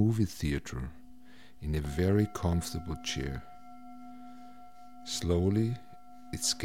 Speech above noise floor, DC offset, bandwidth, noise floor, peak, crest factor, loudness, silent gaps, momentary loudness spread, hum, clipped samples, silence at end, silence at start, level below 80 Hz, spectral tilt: 26 dB; 0.4%; 16.5 kHz; -57 dBFS; -16 dBFS; 18 dB; -32 LUFS; none; 23 LU; none; under 0.1%; 0 s; 0 s; -46 dBFS; -5 dB/octave